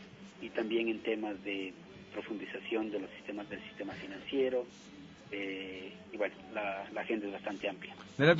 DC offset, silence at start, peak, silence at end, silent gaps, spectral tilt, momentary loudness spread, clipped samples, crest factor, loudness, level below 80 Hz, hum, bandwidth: under 0.1%; 0 s; -10 dBFS; 0 s; none; -4 dB/octave; 13 LU; under 0.1%; 26 dB; -38 LUFS; -72 dBFS; none; 7.6 kHz